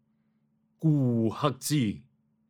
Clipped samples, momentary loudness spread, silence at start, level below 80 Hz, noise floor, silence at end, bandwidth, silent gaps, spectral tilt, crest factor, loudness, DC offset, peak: under 0.1%; 6 LU; 0.8 s; -68 dBFS; -71 dBFS; 0.5 s; 18.5 kHz; none; -6.5 dB/octave; 22 dB; -28 LUFS; under 0.1%; -8 dBFS